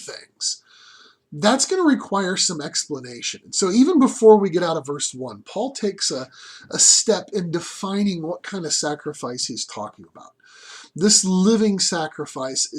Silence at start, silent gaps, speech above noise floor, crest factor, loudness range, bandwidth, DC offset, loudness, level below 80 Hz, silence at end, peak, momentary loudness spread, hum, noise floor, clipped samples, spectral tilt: 0 s; none; 30 dB; 20 dB; 7 LU; 14 kHz; under 0.1%; -19 LUFS; -66 dBFS; 0 s; 0 dBFS; 16 LU; none; -50 dBFS; under 0.1%; -3 dB/octave